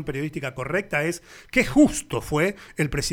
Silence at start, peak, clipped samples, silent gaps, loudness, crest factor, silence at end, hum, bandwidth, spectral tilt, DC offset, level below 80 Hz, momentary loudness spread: 0 s; -6 dBFS; under 0.1%; none; -24 LUFS; 18 dB; 0 s; none; 17.5 kHz; -5 dB/octave; under 0.1%; -42 dBFS; 11 LU